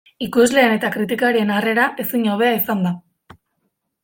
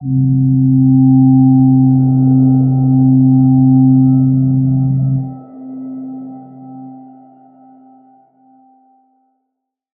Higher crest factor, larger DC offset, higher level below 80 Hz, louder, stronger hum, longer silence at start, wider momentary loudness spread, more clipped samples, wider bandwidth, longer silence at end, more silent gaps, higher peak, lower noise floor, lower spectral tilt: about the same, 16 dB vs 12 dB; neither; second, -60 dBFS vs -44 dBFS; second, -17 LUFS vs -10 LUFS; neither; first, 0.2 s vs 0 s; second, 7 LU vs 20 LU; neither; first, 17 kHz vs 1.4 kHz; second, 1.05 s vs 3 s; neither; about the same, -2 dBFS vs -2 dBFS; about the same, -72 dBFS vs -75 dBFS; second, -5 dB/octave vs -17 dB/octave